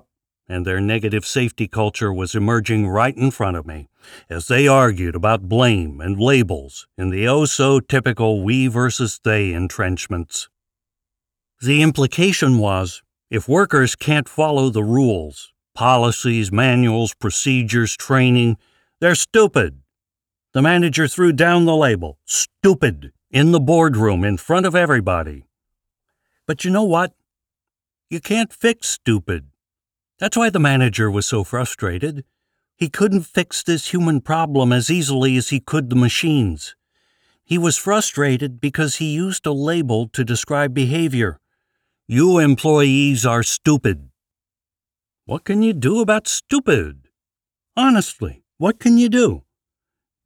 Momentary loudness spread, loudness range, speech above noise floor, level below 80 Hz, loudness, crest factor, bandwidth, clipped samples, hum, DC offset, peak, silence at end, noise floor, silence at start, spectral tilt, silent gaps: 11 LU; 4 LU; over 73 dB; -44 dBFS; -17 LUFS; 14 dB; 17.5 kHz; under 0.1%; none; under 0.1%; -4 dBFS; 0.85 s; under -90 dBFS; 0.5 s; -5 dB/octave; none